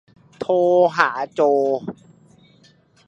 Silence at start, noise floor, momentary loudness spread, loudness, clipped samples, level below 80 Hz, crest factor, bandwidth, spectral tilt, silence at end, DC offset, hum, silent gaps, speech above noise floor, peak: 0.4 s; -55 dBFS; 12 LU; -18 LUFS; under 0.1%; -68 dBFS; 20 dB; 8 kHz; -6 dB/octave; 1.15 s; under 0.1%; none; none; 37 dB; 0 dBFS